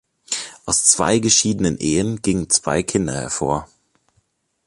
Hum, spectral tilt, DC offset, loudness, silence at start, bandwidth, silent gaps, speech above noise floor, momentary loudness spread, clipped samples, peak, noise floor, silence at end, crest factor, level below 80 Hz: none; -3 dB/octave; under 0.1%; -18 LUFS; 0.3 s; 11.5 kHz; none; 47 dB; 12 LU; under 0.1%; 0 dBFS; -66 dBFS; 1 s; 20 dB; -44 dBFS